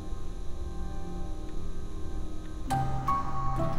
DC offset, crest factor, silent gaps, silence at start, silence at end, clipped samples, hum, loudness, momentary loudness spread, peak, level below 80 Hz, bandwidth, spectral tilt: under 0.1%; 14 dB; none; 0 s; 0 s; under 0.1%; none; -36 LUFS; 11 LU; -16 dBFS; -36 dBFS; 12 kHz; -6.5 dB/octave